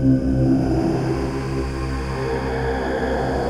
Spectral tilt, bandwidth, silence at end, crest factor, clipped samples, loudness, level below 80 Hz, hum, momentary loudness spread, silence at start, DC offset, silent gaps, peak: -7.5 dB/octave; 11 kHz; 0 s; 14 dB; under 0.1%; -22 LUFS; -30 dBFS; none; 7 LU; 0 s; under 0.1%; none; -6 dBFS